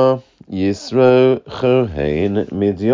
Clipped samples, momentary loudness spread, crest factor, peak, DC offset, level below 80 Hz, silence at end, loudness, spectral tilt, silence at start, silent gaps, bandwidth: under 0.1%; 9 LU; 14 dB; -2 dBFS; under 0.1%; -40 dBFS; 0 s; -16 LUFS; -7.5 dB/octave; 0 s; none; 7.6 kHz